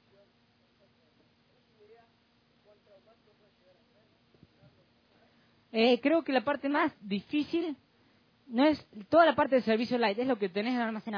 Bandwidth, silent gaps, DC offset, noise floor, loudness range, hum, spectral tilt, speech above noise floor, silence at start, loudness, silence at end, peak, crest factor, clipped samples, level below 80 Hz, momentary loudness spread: 5.4 kHz; none; under 0.1%; -68 dBFS; 5 LU; none; -6.5 dB/octave; 40 dB; 5.75 s; -29 LUFS; 0 s; -10 dBFS; 22 dB; under 0.1%; -72 dBFS; 12 LU